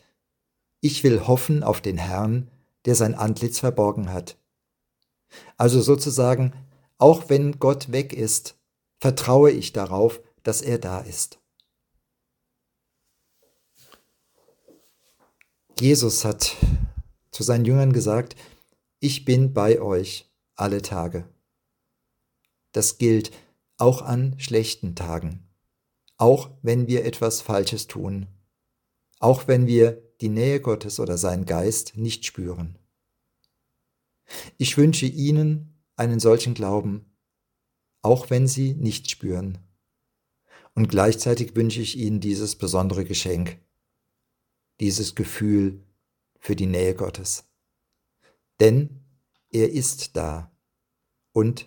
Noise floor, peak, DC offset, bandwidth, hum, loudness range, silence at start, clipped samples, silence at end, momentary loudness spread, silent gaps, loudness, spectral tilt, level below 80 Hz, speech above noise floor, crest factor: -80 dBFS; 0 dBFS; under 0.1%; 18 kHz; none; 6 LU; 0.85 s; under 0.1%; 0.05 s; 13 LU; none; -22 LUFS; -5.5 dB/octave; -44 dBFS; 59 dB; 24 dB